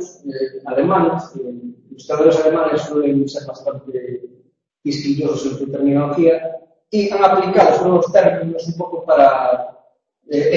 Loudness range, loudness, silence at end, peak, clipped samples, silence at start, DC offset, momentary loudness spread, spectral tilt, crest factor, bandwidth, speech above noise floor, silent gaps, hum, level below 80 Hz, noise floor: 6 LU; -16 LUFS; 0 s; 0 dBFS; under 0.1%; 0 s; under 0.1%; 17 LU; -7 dB/octave; 16 dB; 7.6 kHz; 39 dB; none; none; -58 dBFS; -56 dBFS